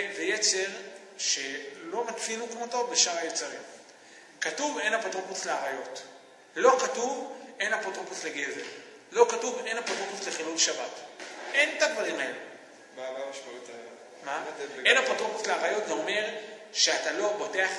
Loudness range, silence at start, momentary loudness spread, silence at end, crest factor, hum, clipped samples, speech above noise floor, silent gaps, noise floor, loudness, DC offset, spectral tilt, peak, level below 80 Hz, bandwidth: 4 LU; 0 s; 18 LU; 0 s; 24 dB; none; under 0.1%; 23 dB; none; -52 dBFS; -28 LUFS; under 0.1%; 0 dB/octave; -6 dBFS; -90 dBFS; 12 kHz